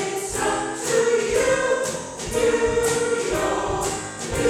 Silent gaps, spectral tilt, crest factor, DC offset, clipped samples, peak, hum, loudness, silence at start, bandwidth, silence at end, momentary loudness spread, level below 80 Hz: none; -3 dB/octave; 10 dB; under 0.1%; under 0.1%; -12 dBFS; none; -22 LUFS; 0 s; 17 kHz; 0 s; 7 LU; -42 dBFS